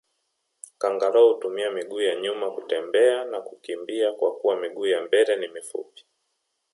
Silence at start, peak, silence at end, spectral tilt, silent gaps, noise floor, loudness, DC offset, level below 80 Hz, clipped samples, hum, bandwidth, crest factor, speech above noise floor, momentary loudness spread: 0.8 s; -6 dBFS; 0.9 s; -2.5 dB/octave; none; -76 dBFS; -24 LUFS; under 0.1%; -84 dBFS; under 0.1%; none; 11.5 kHz; 18 dB; 53 dB; 15 LU